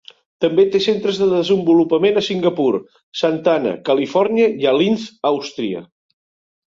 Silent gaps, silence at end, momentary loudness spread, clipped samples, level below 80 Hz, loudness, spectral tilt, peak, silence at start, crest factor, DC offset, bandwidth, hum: 3.03-3.12 s; 0.9 s; 8 LU; under 0.1%; -62 dBFS; -17 LUFS; -6 dB/octave; -2 dBFS; 0.4 s; 14 dB; under 0.1%; 7.6 kHz; none